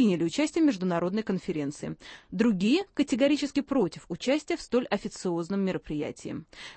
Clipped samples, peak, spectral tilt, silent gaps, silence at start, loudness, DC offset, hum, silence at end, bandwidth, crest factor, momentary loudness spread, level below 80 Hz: under 0.1%; -10 dBFS; -5.5 dB/octave; none; 0 s; -28 LUFS; under 0.1%; none; 0.05 s; 8.8 kHz; 18 dB; 13 LU; -60 dBFS